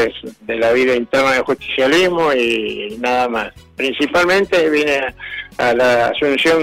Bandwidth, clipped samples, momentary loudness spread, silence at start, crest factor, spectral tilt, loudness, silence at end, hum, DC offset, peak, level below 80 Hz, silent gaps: 16 kHz; under 0.1%; 10 LU; 0 s; 10 dB; -4 dB/octave; -15 LUFS; 0 s; none; under 0.1%; -6 dBFS; -48 dBFS; none